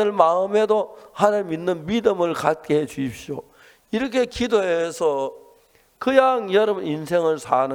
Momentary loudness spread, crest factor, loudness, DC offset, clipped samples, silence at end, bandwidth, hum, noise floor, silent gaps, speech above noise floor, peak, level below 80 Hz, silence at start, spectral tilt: 11 LU; 20 dB; -21 LUFS; under 0.1%; under 0.1%; 0 s; 17 kHz; none; -57 dBFS; none; 36 dB; 0 dBFS; -54 dBFS; 0 s; -5.5 dB/octave